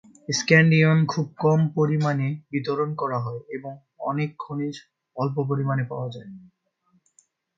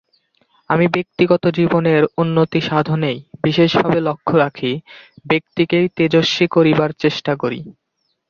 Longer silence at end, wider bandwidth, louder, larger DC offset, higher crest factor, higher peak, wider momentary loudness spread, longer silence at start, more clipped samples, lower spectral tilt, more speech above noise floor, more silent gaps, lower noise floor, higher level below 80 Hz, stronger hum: first, 1.15 s vs 0.6 s; about the same, 7.6 kHz vs 7.2 kHz; second, -23 LUFS vs -16 LUFS; neither; first, 22 dB vs 16 dB; about the same, -2 dBFS vs -2 dBFS; first, 18 LU vs 7 LU; second, 0.3 s vs 0.7 s; neither; about the same, -6 dB/octave vs -7 dB/octave; about the same, 44 dB vs 45 dB; neither; first, -67 dBFS vs -61 dBFS; second, -66 dBFS vs -54 dBFS; neither